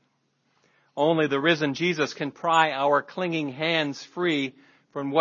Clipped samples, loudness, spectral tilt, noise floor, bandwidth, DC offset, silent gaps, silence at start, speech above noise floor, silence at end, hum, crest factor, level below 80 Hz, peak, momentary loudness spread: under 0.1%; -25 LUFS; -5 dB/octave; -71 dBFS; 7.4 kHz; under 0.1%; none; 0.95 s; 46 dB; 0 s; none; 22 dB; -78 dBFS; -4 dBFS; 9 LU